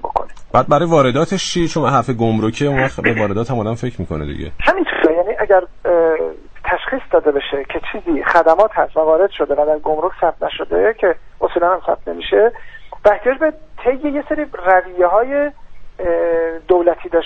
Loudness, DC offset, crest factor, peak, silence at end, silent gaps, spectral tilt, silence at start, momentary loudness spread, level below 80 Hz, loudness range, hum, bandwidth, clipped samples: -16 LUFS; under 0.1%; 16 dB; 0 dBFS; 0 s; none; -6 dB/octave; 0 s; 9 LU; -38 dBFS; 2 LU; none; 9 kHz; under 0.1%